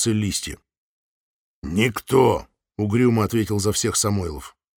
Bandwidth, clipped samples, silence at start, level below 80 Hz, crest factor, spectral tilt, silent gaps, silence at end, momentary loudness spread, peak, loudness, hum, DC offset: 20 kHz; under 0.1%; 0 s; -46 dBFS; 20 dB; -5 dB/octave; 0.78-1.62 s; 0.3 s; 17 LU; -4 dBFS; -21 LUFS; none; under 0.1%